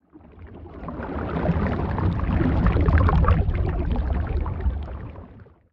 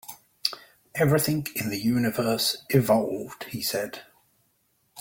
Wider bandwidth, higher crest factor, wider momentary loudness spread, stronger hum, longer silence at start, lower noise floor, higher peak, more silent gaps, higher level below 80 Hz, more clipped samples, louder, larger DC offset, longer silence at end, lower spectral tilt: second, 5.2 kHz vs 17 kHz; about the same, 20 dB vs 22 dB; first, 19 LU vs 14 LU; neither; about the same, 0.15 s vs 0.1 s; second, -46 dBFS vs -70 dBFS; about the same, -4 dBFS vs -6 dBFS; neither; first, -28 dBFS vs -60 dBFS; neither; about the same, -24 LUFS vs -26 LUFS; neither; first, 0.3 s vs 0 s; first, -10.5 dB/octave vs -5 dB/octave